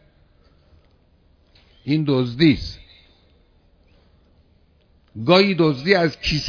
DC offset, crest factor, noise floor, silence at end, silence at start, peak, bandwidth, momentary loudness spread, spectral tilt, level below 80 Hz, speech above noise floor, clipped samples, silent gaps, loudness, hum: under 0.1%; 20 dB; -57 dBFS; 0 s; 1.85 s; -2 dBFS; 5.4 kHz; 20 LU; -6.5 dB/octave; -44 dBFS; 39 dB; under 0.1%; none; -18 LUFS; none